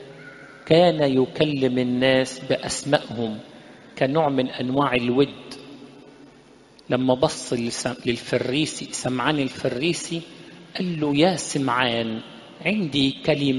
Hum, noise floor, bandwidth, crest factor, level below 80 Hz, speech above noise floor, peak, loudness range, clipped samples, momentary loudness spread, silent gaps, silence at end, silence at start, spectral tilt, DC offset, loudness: none; -51 dBFS; 11.5 kHz; 22 dB; -56 dBFS; 28 dB; 0 dBFS; 4 LU; under 0.1%; 18 LU; none; 0 s; 0 s; -5 dB/octave; under 0.1%; -22 LUFS